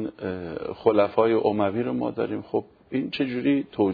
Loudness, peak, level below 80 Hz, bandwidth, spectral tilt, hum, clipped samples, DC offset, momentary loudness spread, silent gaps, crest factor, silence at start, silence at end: -25 LUFS; -6 dBFS; -60 dBFS; 5 kHz; -9.5 dB/octave; none; under 0.1%; under 0.1%; 11 LU; none; 18 dB; 0 s; 0 s